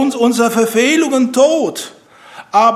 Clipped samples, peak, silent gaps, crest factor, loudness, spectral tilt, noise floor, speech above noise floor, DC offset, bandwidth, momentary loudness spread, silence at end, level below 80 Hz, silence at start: under 0.1%; 0 dBFS; none; 14 dB; -13 LUFS; -3.5 dB/octave; -38 dBFS; 25 dB; under 0.1%; 15.5 kHz; 9 LU; 0 s; -66 dBFS; 0 s